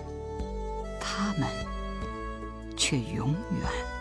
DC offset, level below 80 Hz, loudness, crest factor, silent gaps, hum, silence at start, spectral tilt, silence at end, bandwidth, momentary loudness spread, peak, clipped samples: under 0.1%; -40 dBFS; -32 LUFS; 18 dB; none; none; 0 s; -4.5 dB/octave; 0 s; 11 kHz; 11 LU; -14 dBFS; under 0.1%